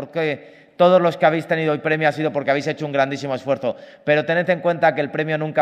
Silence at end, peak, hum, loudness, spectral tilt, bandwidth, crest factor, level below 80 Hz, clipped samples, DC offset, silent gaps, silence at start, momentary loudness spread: 0 s; -4 dBFS; none; -20 LUFS; -6.5 dB/octave; 9.8 kHz; 16 dB; -70 dBFS; under 0.1%; under 0.1%; none; 0 s; 8 LU